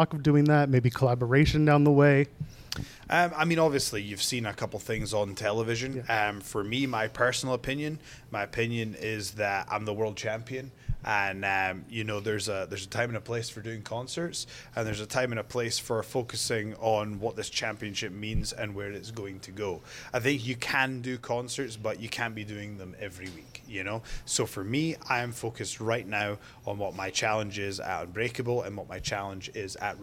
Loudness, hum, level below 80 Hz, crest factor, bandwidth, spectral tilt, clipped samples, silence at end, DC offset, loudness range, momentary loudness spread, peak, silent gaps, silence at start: -30 LUFS; none; -48 dBFS; 20 dB; 16.5 kHz; -5 dB/octave; under 0.1%; 0 s; under 0.1%; 8 LU; 14 LU; -10 dBFS; none; 0 s